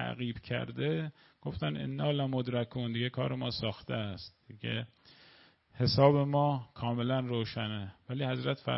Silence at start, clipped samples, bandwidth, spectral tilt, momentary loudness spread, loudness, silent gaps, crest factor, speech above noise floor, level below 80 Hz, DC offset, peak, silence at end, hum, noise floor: 0 s; under 0.1%; 5.8 kHz; -10 dB/octave; 13 LU; -33 LUFS; none; 22 dB; 29 dB; -60 dBFS; under 0.1%; -10 dBFS; 0 s; none; -62 dBFS